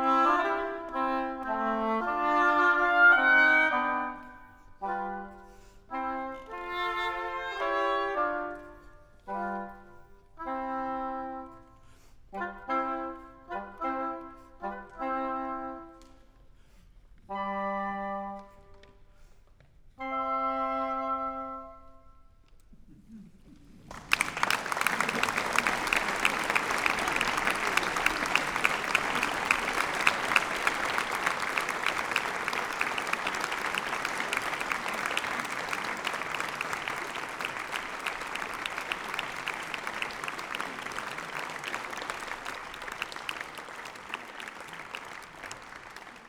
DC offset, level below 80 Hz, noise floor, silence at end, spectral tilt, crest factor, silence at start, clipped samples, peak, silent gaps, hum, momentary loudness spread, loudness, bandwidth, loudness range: under 0.1%; -58 dBFS; -57 dBFS; 0 s; -2.5 dB/octave; 28 dB; 0 s; under 0.1%; -4 dBFS; none; none; 15 LU; -29 LUFS; over 20 kHz; 13 LU